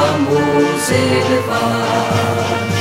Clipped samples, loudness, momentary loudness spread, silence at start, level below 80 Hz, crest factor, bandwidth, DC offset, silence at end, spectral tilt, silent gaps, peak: under 0.1%; -15 LUFS; 3 LU; 0 s; -48 dBFS; 14 dB; 16 kHz; under 0.1%; 0 s; -5 dB/octave; none; 0 dBFS